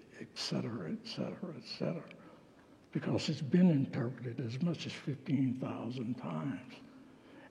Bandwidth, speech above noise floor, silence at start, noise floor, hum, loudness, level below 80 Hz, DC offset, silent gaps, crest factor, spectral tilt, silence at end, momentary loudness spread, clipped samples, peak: 10.5 kHz; 25 dB; 0 s; -61 dBFS; none; -36 LUFS; -78 dBFS; under 0.1%; none; 20 dB; -7 dB/octave; 0 s; 20 LU; under 0.1%; -18 dBFS